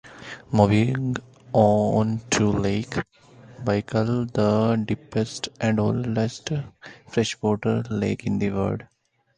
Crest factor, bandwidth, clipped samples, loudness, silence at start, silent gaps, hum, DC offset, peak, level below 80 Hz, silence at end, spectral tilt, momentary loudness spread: 22 dB; 10 kHz; under 0.1%; -24 LUFS; 0.05 s; none; none; under 0.1%; -2 dBFS; -50 dBFS; 0.5 s; -6 dB/octave; 11 LU